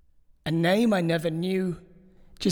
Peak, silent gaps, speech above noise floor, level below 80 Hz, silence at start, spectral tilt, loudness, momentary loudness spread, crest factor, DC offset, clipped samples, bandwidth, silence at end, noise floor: -10 dBFS; none; 28 dB; -56 dBFS; 0.45 s; -6.5 dB/octave; -25 LUFS; 12 LU; 16 dB; under 0.1%; under 0.1%; 18.5 kHz; 0 s; -52 dBFS